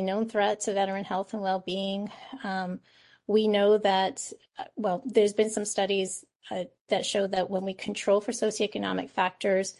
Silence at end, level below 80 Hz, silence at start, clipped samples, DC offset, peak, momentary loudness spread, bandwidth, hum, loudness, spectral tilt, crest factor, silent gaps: 0.05 s; -72 dBFS; 0 s; under 0.1%; under 0.1%; -10 dBFS; 14 LU; 11.5 kHz; none; -28 LUFS; -4 dB/octave; 18 dB; 6.36-6.40 s, 6.81-6.85 s